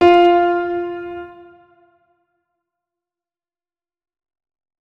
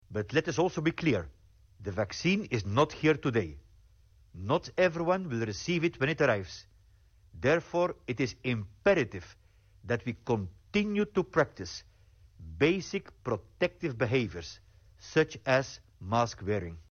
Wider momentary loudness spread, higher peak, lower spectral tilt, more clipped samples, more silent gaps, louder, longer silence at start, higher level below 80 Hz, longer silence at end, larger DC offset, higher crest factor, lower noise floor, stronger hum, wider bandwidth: first, 22 LU vs 14 LU; first, 0 dBFS vs -14 dBFS; about the same, -6 dB/octave vs -6 dB/octave; neither; neither; first, -16 LUFS vs -30 LUFS; about the same, 0 s vs 0.1 s; about the same, -54 dBFS vs -58 dBFS; first, 3.5 s vs 0.1 s; neither; about the same, 20 dB vs 18 dB; first, under -90 dBFS vs -61 dBFS; neither; second, 5.8 kHz vs 7.2 kHz